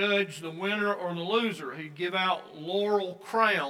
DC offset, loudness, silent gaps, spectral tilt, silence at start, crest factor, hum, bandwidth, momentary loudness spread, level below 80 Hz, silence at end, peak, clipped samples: under 0.1%; -29 LUFS; none; -4.5 dB/octave; 0 s; 20 dB; none; 15 kHz; 8 LU; -88 dBFS; 0 s; -10 dBFS; under 0.1%